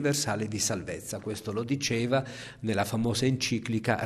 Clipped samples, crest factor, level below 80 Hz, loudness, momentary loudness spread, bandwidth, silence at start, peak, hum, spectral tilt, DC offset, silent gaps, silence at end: under 0.1%; 18 dB; -58 dBFS; -30 LUFS; 9 LU; 14.5 kHz; 0 s; -10 dBFS; none; -4.5 dB/octave; under 0.1%; none; 0 s